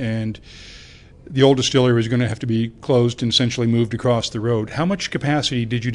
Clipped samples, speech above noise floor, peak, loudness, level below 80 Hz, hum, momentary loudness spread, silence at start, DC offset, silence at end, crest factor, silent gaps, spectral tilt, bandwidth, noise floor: under 0.1%; 24 dB; -2 dBFS; -19 LUFS; -48 dBFS; none; 11 LU; 0 s; under 0.1%; 0 s; 18 dB; none; -5.5 dB/octave; 10.5 kHz; -43 dBFS